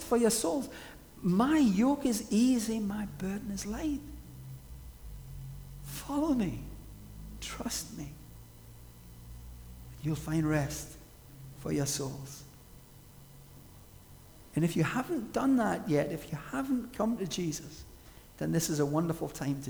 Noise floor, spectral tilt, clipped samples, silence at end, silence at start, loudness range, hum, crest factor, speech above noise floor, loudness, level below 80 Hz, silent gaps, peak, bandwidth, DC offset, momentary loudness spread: -54 dBFS; -5.5 dB/octave; under 0.1%; 0 s; 0 s; 10 LU; none; 18 dB; 23 dB; -32 LUFS; -52 dBFS; none; -14 dBFS; over 20 kHz; under 0.1%; 24 LU